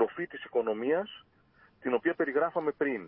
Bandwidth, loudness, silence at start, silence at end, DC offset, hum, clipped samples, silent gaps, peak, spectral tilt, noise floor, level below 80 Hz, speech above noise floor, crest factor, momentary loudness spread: 3.7 kHz; -31 LUFS; 0 s; 0 s; under 0.1%; none; under 0.1%; none; -16 dBFS; -9 dB/octave; -63 dBFS; -76 dBFS; 33 dB; 16 dB; 10 LU